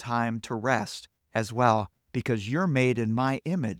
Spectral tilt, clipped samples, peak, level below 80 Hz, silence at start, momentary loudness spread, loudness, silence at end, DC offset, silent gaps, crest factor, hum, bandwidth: -6.5 dB/octave; under 0.1%; -6 dBFS; -62 dBFS; 0 s; 9 LU; -27 LUFS; 0 s; under 0.1%; none; 22 dB; none; 14.5 kHz